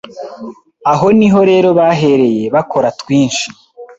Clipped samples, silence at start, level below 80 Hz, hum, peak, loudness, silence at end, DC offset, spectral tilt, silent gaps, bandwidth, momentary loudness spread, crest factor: under 0.1%; 0.05 s; -50 dBFS; none; 0 dBFS; -11 LUFS; 0.05 s; under 0.1%; -6 dB/octave; none; 8 kHz; 19 LU; 12 dB